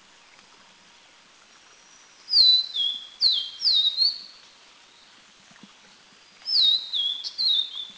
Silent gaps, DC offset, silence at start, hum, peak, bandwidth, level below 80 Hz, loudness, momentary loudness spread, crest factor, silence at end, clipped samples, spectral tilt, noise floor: none; under 0.1%; 2.3 s; none; -8 dBFS; 8 kHz; -76 dBFS; -20 LUFS; 10 LU; 20 dB; 0.05 s; under 0.1%; 1.5 dB/octave; -54 dBFS